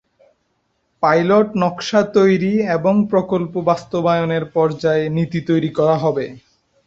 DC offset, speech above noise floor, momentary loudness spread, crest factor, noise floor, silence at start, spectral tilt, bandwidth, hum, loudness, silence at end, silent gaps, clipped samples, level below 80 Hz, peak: under 0.1%; 51 dB; 6 LU; 16 dB; -67 dBFS; 1 s; -7 dB/octave; 7.8 kHz; none; -17 LUFS; 0.5 s; none; under 0.1%; -56 dBFS; -2 dBFS